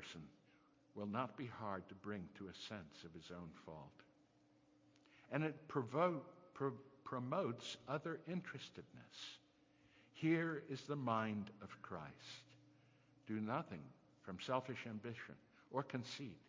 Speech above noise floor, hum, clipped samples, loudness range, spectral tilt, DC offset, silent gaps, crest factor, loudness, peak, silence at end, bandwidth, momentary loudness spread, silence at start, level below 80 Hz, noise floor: 28 dB; none; under 0.1%; 7 LU; -6 dB/octave; under 0.1%; none; 24 dB; -46 LUFS; -24 dBFS; 0 s; 7.6 kHz; 17 LU; 0 s; -78 dBFS; -74 dBFS